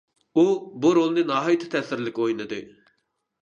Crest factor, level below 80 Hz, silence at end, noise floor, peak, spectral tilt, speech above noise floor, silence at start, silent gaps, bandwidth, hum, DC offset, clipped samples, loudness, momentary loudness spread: 18 dB; -72 dBFS; 0.75 s; -74 dBFS; -6 dBFS; -6 dB/octave; 52 dB; 0.35 s; none; 7.4 kHz; none; under 0.1%; under 0.1%; -23 LUFS; 9 LU